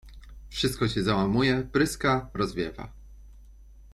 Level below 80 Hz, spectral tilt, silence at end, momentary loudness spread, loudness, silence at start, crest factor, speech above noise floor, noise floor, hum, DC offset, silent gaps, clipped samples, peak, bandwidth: -46 dBFS; -5.5 dB/octave; 0.05 s; 12 LU; -26 LUFS; 0.05 s; 18 dB; 24 dB; -50 dBFS; none; under 0.1%; none; under 0.1%; -10 dBFS; 16 kHz